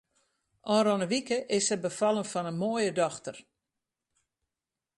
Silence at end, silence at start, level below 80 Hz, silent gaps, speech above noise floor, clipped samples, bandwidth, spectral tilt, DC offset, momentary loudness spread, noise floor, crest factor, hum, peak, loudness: 1.55 s; 0.65 s; -74 dBFS; none; 61 dB; under 0.1%; 11.5 kHz; -4 dB/octave; under 0.1%; 8 LU; -90 dBFS; 16 dB; none; -14 dBFS; -29 LUFS